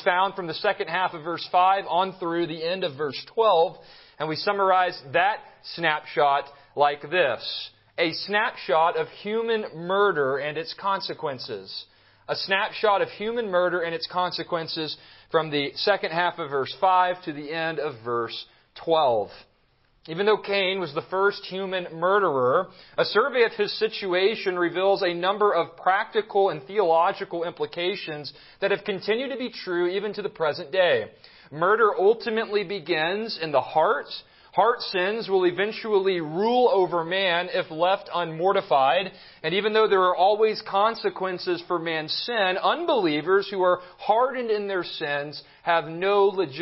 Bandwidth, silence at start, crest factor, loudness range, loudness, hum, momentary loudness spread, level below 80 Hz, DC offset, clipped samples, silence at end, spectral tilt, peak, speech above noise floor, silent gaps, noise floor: 5.8 kHz; 0 s; 18 dB; 3 LU; -24 LUFS; none; 10 LU; -70 dBFS; under 0.1%; under 0.1%; 0 s; -8.5 dB/octave; -6 dBFS; 39 dB; none; -64 dBFS